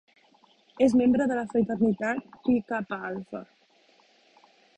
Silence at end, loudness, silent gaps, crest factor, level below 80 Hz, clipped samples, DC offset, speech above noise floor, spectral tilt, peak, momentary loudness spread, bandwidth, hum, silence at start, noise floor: 1.35 s; -26 LUFS; none; 18 dB; -60 dBFS; under 0.1%; under 0.1%; 37 dB; -7 dB/octave; -10 dBFS; 14 LU; 9.6 kHz; none; 0.8 s; -62 dBFS